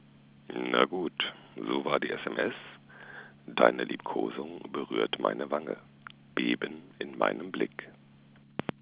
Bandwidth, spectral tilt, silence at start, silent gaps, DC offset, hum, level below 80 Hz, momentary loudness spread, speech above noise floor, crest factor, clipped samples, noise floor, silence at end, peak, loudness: 4 kHz; -2.5 dB/octave; 0.5 s; none; under 0.1%; none; -74 dBFS; 20 LU; 26 dB; 28 dB; under 0.1%; -57 dBFS; 0.2 s; -6 dBFS; -32 LUFS